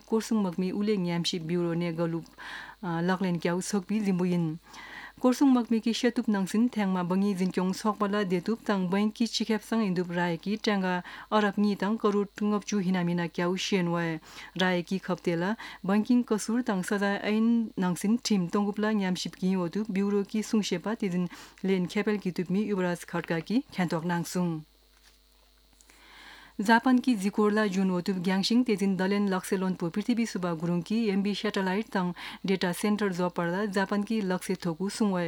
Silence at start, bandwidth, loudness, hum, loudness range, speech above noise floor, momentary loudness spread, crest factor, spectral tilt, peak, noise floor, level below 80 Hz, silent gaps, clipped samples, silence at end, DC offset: 0.1 s; 17.5 kHz; -28 LUFS; none; 3 LU; 33 dB; 6 LU; 18 dB; -6 dB/octave; -10 dBFS; -61 dBFS; -66 dBFS; none; under 0.1%; 0 s; under 0.1%